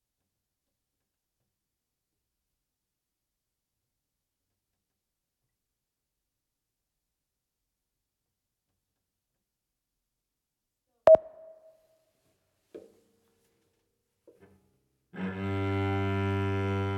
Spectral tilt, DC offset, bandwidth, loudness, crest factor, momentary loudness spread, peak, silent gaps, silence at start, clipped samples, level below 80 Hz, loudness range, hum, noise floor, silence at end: -8.5 dB/octave; under 0.1%; 8.2 kHz; -27 LUFS; 28 dB; 16 LU; -6 dBFS; none; 11.05 s; under 0.1%; -72 dBFS; 10 LU; none; -87 dBFS; 0 s